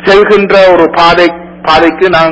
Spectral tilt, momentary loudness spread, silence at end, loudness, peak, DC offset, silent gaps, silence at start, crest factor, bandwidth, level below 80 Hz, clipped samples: -5.5 dB/octave; 5 LU; 0 s; -6 LUFS; 0 dBFS; under 0.1%; none; 0 s; 6 dB; 8 kHz; -34 dBFS; 5%